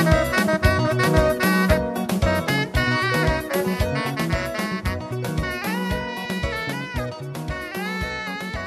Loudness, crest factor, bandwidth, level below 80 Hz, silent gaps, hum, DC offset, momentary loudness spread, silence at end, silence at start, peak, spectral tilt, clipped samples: -23 LUFS; 18 dB; 15 kHz; -32 dBFS; none; none; under 0.1%; 9 LU; 0 s; 0 s; -4 dBFS; -5.5 dB/octave; under 0.1%